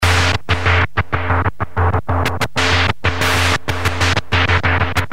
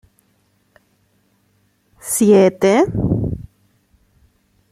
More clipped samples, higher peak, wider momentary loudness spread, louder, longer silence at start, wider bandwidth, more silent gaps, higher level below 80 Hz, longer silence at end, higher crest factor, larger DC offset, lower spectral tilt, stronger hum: neither; about the same, 0 dBFS vs -2 dBFS; second, 4 LU vs 17 LU; about the same, -16 LUFS vs -15 LUFS; second, 0 s vs 2.05 s; about the same, 16 kHz vs 15.5 kHz; neither; first, -30 dBFS vs -42 dBFS; second, 0.05 s vs 1.3 s; about the same, 16 dB vs 18 dB; first, 6% vs under 0.1%; second, -4.5 dB/octave vs -6 dB/octave; neither